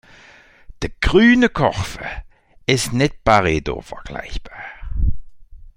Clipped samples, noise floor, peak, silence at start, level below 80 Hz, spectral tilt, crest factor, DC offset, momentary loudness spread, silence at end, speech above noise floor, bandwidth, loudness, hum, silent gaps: under 0.1%; -47 dBFS; 0 dBFS; 0.8 s; -30 dBFS; -5 dB/octave; 20 dB; under 0.1%; 20 LU; 0.1 s; 30 dB; 16 kHz; -18 LUFS; none; none